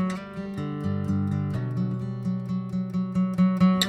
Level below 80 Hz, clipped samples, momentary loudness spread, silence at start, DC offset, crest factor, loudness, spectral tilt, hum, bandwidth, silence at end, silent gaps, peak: -56 dBFS; under 0.1%; 9 LU; 0 s; under 0.1%; 18 dB; -27 LUFS; -6.5 dB/octave; none; 14 kHz; 0 s; none; -8 dBFS